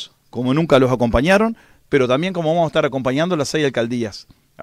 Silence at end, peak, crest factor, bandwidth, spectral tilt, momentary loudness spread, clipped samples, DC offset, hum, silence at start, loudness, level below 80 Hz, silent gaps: 0 s; -2 dBFS; 16 dB; 15 kHz; -6 dB/octave; 10 LU; under 0.1%; under 0.1%; none; 0 s; -18 LUFS; -38 dBFS; none